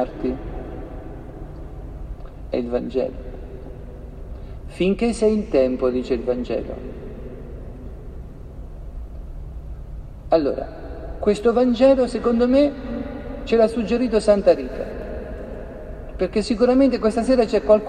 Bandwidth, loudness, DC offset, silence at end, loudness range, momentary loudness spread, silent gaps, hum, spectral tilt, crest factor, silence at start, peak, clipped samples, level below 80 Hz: 10 kHz; -20 LUFS; under 0.1%; 0 s; 11 LU; 21 LU; none; none; -6.5 dB/octave; 18 dB; 0 s; -2 dBFS; under 0.1%; -36 dBFS